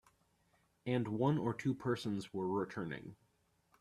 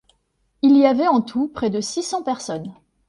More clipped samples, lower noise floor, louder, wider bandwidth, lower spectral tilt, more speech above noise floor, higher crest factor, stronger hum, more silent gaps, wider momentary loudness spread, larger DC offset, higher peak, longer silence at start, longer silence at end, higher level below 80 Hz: neither; first, -76 dBFS vs -67 dBFS; second, -38 LUFS vs -19 LUFS; first, 13 kHz vs 11.5 kHz; first, -7.5 dB/octave vs -5 dB/octave; second, 39 dB vs 49 dB; about the same, 20 dB vs 18 dB; neither; neither; about the same, 12 LU vs 14 LU; neither; second, -20 dBFS vs -2 dBFS; first, 0.85 s vs 0.65 s; first, 0.65 s vs 0.35 s; second, -72 dBFS vs -58 dBFS